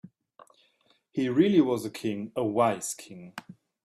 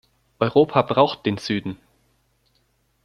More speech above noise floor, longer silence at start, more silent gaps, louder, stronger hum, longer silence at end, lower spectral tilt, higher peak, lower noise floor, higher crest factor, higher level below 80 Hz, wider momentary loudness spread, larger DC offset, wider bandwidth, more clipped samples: second, 41 dB vs 46 dB; first, 1.15 s vs 0.4 s; neither; second, -27 LUFS vs -20 LUFS; neither; second, 0.35 s vs 1.3 s; about the same, -5.5 dB/octave vs -6.5 dB/octave; second, -10 dBFS vs -2 dBFS; about the same, -68 dBFS vs -66 dBFS; about the same, 20 dB vs 22 dB; second, -70 dBFS vs -60 dBFS; first, 21 LU vs 12 LU; neither; first, 14.5 kHz vs 11 kHz; neither